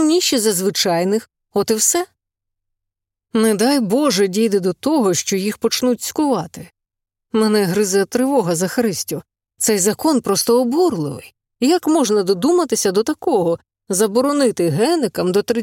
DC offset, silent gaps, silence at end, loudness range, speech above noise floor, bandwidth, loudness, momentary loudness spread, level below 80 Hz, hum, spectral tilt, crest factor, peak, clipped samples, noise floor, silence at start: under 0.1%; none; 0 s; 2 LU; 65 dB; 17 kHz; -17 LUFS; 7 LU; -62 dBFS; none; -4 dB/octave; 16 dB; -2 dBFS; under 0.1%; -82 dBFS; 0 s